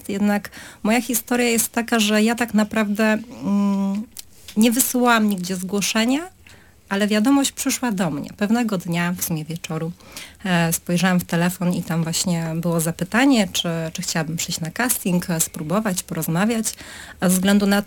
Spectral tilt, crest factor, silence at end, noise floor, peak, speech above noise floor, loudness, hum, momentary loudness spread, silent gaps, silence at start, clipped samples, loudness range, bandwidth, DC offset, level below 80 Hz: -4.5 dB/octave; 18 dB; 0 s; -48 dBFS; -2 dBFS; 28 dB; -20 LUFS; none; 10 LU; none; 0.05 s; under 0.1%; 3 LU; 19 kHz; under 0.1%; -54 dBFS